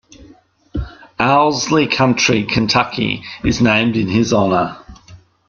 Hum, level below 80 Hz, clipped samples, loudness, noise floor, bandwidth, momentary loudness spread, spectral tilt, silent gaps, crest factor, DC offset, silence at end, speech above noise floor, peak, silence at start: none; -38 dBFS; under 0.1%; -15 LUFS; -47 dBFS; 7.4 kHz; 14 LU; -4.5 dB/octave; none; 16 dB; under 0.1%; 0.35 s; 32 dB; 0 dBFS; 0.2 s